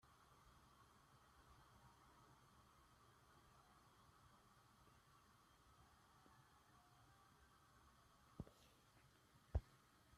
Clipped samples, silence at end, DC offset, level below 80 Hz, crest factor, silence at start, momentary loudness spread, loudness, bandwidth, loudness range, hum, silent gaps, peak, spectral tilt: under 0.1%; 0 s; under 0.1%; -64 dBFS; 30 dB; 0 s; 17 LU; -54 LUFS; 13.5 kHz; 9 LU; none; none; -32 dBFS; -6 dB/octave